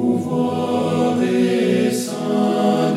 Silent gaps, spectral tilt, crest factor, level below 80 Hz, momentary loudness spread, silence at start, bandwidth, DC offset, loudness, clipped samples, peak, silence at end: none; -6 dB/octave; 12 dB; -70 dBFS; 3 LU; 0 s; 14.5 kHz; under 0.1%; -19 LUFS; under 0.1%; -6 dBFS; 0 s